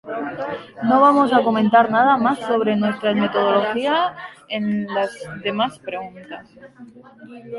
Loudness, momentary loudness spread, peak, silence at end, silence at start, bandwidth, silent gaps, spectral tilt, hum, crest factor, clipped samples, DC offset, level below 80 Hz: -19 LUFS; 16 LU; -2 dBFS; 0 s; 0.05 s; 11.5 kHz; none; -6.5 dB/octave; none; 18 dB; under 0.1%; under 0.1%; -62 dBFS